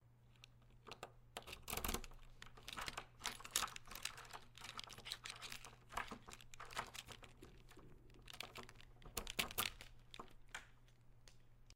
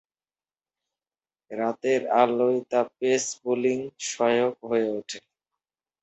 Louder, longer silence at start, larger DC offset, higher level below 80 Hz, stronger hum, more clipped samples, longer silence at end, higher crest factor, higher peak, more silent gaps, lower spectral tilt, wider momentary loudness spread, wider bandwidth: second, -49 LUFS vs -25 LUFS; second, 0 s vs 1.5 s; neither; first, -62 dBFS vs -74 dBFS; neither; neither; second, 0 s vs 0.85 s; first, 36 dB vs 22 dB; second, -16 dBFS vs -6 dBFS; neither; second, -1.5 dB/octave vs -3.5 dB/octave; first, 22 LU vs 11 LU; first, 16 kHz vs 8.2 kHz